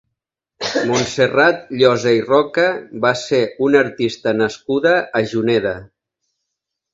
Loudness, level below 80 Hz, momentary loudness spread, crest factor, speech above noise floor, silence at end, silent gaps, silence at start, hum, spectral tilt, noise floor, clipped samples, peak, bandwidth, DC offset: -17 LUFS; -54 dBFS; 6 LU; 18 dB; 64 dB; 1.1 s; none; 0.6 s; none; -4.5 dB/octave; -80 dBFS; under 0.1%; 0 dBFS; 8 kHz; under 0.1%